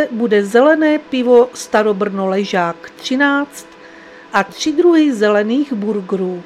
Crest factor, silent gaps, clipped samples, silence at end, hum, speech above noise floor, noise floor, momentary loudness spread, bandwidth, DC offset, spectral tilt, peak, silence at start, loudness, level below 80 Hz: 14 dB; none; under 0.1%; 0.05 s; none; 24 dB; -38 dBFS; 9 LU; 14 kHz; under 0.1%; -5 dB/octave; 0 dBFS; 0 s; -15 LUFS; -60 dBFS